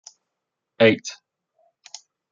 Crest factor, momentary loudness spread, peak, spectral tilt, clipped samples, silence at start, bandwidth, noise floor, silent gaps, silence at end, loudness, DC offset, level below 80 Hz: 22 dB; 24 LU; -2 dBFS; -4.5 dB/octave; under 0.1%; 0.8 s; 7.6 kHz; -82 dBFS; none; 1.2 s; -19 LUFS; under 0.1%; -74 dBFS